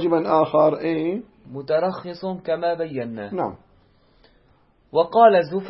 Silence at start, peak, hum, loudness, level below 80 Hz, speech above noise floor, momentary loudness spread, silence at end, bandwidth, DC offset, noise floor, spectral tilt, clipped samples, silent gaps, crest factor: 0 s; -2 dBFS; none; -21 LUFS; -62 dBFS; 38 dB; 15 LU; 0 s; 5.8 kHz; under 0.1%; -58 dBFS; -11 dB/octave; under 0.1%; none; 18 dB